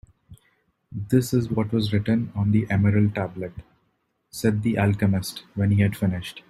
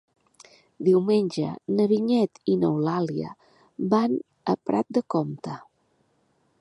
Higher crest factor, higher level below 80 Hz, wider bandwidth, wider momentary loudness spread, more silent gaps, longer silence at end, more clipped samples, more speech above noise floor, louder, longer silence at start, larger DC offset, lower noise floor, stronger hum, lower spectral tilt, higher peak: about the same, 16 dB vs 18 dB; first, -52 dBFS vs -70 dBFS; first, 14 kHz vs 11 kHz; about the same, 12 LU vs 12 LU; neither; second, 0.1 s vs 1 s; neither; first, 49 dB vs 44 dB; about the same, -23 LUFS vs -25 LUFS; second, 0.3 s vs 0.8 s; neither; about the same, -71 dBFS vs -68 dBFS; neither; about the same, -7 dB/octave vs -8 dB/octave; about the same, -8 dBFS vs -8 dBFS